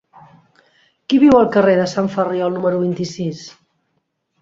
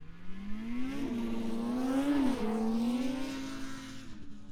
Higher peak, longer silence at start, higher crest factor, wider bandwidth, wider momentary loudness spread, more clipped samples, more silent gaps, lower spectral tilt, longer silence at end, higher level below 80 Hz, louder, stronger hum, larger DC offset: first, -2 dBFS vs -18 dBFS; first, 1.1 s vs 0 s; about the same, 16 dB vs 14 dB; second, 7.8 kHz vs 15 kHz; about the same, 15 LU vs 16 LU; neither; neither; about the same, -6.5 dB/octave vs -5.5 dB/octave; first, 0.9 s vs 0 s; about the same, -54 dBFS vs -50 dBFS; first, -16 LUFS vs -34 LUFS; neither; neither